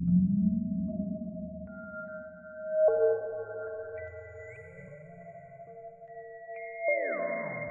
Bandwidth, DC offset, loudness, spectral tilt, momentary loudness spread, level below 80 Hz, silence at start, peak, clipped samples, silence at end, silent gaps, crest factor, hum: 2.6 kHz; under 0.1%; -32 LUFS; -13 dB/octave; 22 LU; -58 dBFS; 0 s; -16 dBFS; under 0.1%; 0 s; none; 16 dB; none